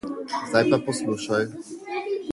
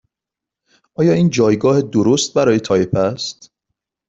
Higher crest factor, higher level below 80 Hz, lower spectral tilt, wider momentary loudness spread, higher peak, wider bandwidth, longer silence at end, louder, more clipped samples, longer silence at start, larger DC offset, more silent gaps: first, 20 dB vs 14 dB; second, -64 dBFS vs -52 dBFS; about the same, -5 dB/octave vs -5.5 dB/octave; first, 11 LU vs 8 LU; second, -6 dBFS vs -2 dBFS; first, 11.5 kHz vs 8 kHz; second, 0 s vs 0.75 s; second, -25 LUFS vs -15 LUFS; neither; second, 0.05 s vs 1 s; neither; neither